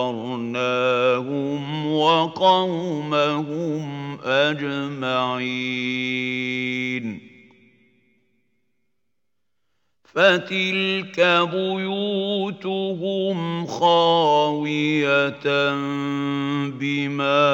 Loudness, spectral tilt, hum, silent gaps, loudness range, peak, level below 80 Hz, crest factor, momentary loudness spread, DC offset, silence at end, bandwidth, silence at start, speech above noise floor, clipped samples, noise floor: -21 LUFS; -5.5 dB/octave; none; none; 7 LU; -2 dBFS; -74 dBFS; 20 dB; 9 LU; under 0.1%; 0 s; 16.5 kHz; 0 s; 60 dB; under 0.1%; -81 dBFS